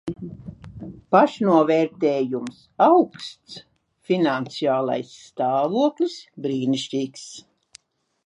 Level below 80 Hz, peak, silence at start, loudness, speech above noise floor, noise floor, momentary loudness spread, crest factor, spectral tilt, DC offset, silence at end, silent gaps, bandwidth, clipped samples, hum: -60 dBFS; -4 dBFS; 0.05 s; -21 LUFS; 32 dB; -53 dBFS; 22 LU; 20 dB; -6 dB/octave; under 0.1%; 0.9 s; none; 11 kHz; under 0.1%; none